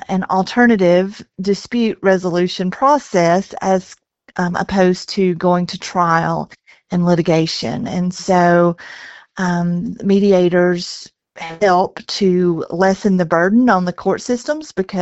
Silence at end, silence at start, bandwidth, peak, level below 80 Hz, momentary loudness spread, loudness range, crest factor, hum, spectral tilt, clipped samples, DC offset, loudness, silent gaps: 0 s; 0.1 s; 8.2 kHz; 0 dBFS; -50 dBFS; 10 LU; 2 LU; 16 dB; none; -6 dB/octave; under 0.1%; under 0.1%; -16 LUFS; none